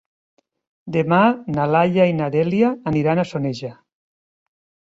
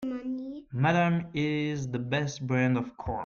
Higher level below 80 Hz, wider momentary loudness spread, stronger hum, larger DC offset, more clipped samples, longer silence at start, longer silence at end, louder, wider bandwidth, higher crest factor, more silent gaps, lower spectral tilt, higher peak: about the same, -56 dBFS vs -56 dBFS; about the same, 9 LU vs 10 LU; neither; neither; neither; first, 0.85 s vs 0 s; first, 1.15 s vs 0 s; first, -19 LUFS vs -29 LUFS; about the same, 7.8 kHz vs 7.2 kHz; about the same, 18 dB vs 16 dB; neither; first, -8 dB/octave vs -6.5 dB/octave; first, -2 dBFS vs -12 dBFS